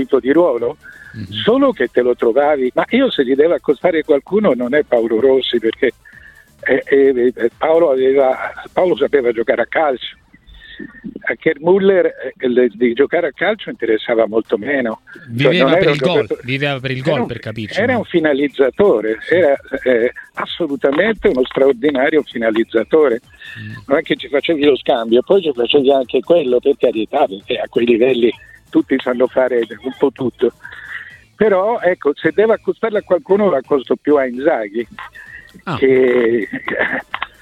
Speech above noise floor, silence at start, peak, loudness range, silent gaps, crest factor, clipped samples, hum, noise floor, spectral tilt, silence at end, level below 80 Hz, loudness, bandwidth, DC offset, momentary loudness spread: 28 dB; 0 s; 0 dBFS; 3 LU; none; 16 dB; under 0.1%; none; -43 dBFS; -7 dB/octave; 0.15 s; -52 dBFS; -15 LUFS; 9 kHz; under 0.1%; 11 LU